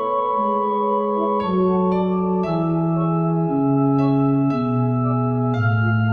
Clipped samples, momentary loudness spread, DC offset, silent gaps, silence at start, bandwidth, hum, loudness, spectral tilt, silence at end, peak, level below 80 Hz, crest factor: under 0.1%; 3 LU; under 0.1%; none; 0 s; 5 kHz; none; -20 LUFS; -11 dB/octave; 0 s; -8 dBFS; -52 dBFS; 12 dB